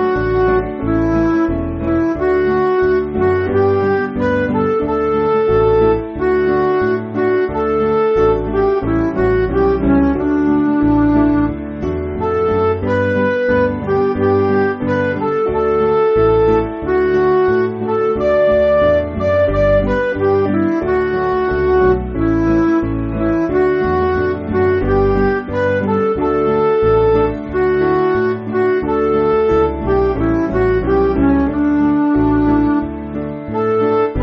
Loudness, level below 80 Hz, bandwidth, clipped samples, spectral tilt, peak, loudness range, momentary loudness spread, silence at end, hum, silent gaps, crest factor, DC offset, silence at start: -15 LUFS; -30 dBFS; 6.2 kHz; under 0.1%; -7 dB/octave; -2 dBFS; 1 LU; 4 LU; 0 s; none; none; 12 dB; under 0.1%; 0 s